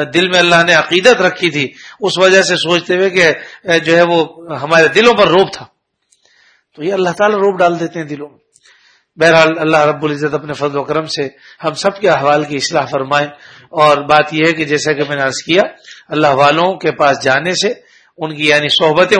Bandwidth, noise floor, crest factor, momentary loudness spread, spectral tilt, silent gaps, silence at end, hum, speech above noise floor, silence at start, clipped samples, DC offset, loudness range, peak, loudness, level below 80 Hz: 11 kHz; -59 dBFS; 12 dB; 13 LU; -4 dB/octave; none; 0 s; none; 47 dB; 0 s; 0.2%; under 0.1%; 5 LU; 0 dBFS; -12 LUFS; -54 dBFS